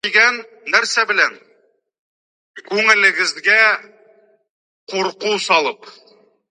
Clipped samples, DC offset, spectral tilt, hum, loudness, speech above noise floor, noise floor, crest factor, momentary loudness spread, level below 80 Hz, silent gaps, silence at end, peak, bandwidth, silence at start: under 0.1%; under 0.1%; -1 dB/octave; none; -15 LUFS; 42 dB; -59 dBFS; 18 dB; 12 LU; -78 dBFS; 1.99-2.54 s, 4.50-4.87 s; 0.6 s; 0 dBFS; 11 kHz; 0.05 s